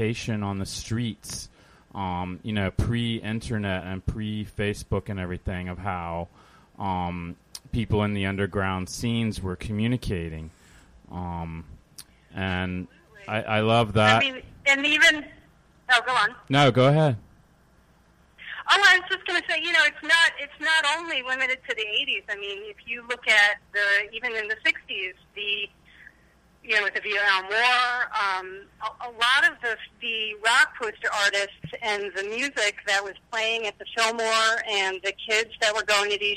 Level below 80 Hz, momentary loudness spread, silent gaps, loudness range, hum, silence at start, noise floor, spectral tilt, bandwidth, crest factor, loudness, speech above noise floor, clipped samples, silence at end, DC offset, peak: -48 dBFS; 15 LU; none; 10 LU; none; 0 s; -59 dBFS; -4 dB/octave; 15.5 kHz; 18 dB; -24 LUFS; 34 dB; under 0.1%; 0 s; under 0.1%; -8 dBFS